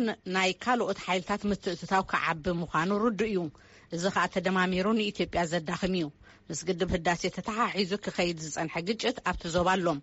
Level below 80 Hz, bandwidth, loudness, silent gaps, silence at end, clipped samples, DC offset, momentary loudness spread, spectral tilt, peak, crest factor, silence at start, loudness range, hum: -52 dBFS; 8 kHz; -29 LUFS; none; 0 s; under 0.1%; under 0.1%; 6 LU; -3.5 dB/octave; -14 dBFS; 16 dB; 0 s; 2 LU; none